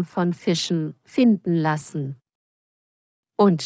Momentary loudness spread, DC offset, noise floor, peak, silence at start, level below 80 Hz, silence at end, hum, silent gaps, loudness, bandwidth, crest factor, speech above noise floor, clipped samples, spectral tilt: 14 LU; under 0.1%; under -90 dBFS; -6 dBFS; 0 s; -70 dBFS; 0 s; none; 2.35-3.23 s; -22 LUFS; 8 kHz; 18 dB; over 69 dB; under 0.1%; -6 dB/octave